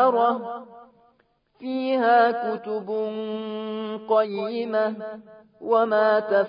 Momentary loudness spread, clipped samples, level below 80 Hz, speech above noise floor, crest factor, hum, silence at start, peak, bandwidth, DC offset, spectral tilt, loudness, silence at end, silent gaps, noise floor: 16 LU; under 0.1%; -78 dBFS; 42 dB; 16 dB; none; 0 s; -6 dBFS; 5.2 kHz; under 0.1%; -9.5 dB/octave; -23 LUFS; 0 s; none; -65 dBFS